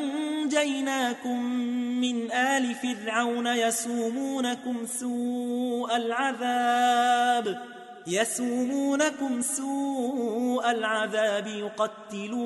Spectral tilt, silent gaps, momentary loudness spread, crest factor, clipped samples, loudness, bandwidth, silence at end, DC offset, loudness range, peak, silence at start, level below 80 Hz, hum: -2.5 dB/octave; none; 7 LU; 16 dB; under 0.1%; -27 LUFS; 12 kHz; 0 s; under 0.1%; 2 LU; -10 dBFS; 0 s; -78 dBFS; none